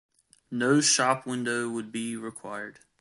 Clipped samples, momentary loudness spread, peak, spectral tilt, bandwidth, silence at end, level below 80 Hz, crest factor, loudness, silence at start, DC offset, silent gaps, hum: under 0.1%; 16 LU; -8 dBFS; -3 dB/octave; 11.5 kHz; 0.3 s; -74 dBFS; 20 dB; -26 LUFS; 0.5 s; under 0.1%; none; none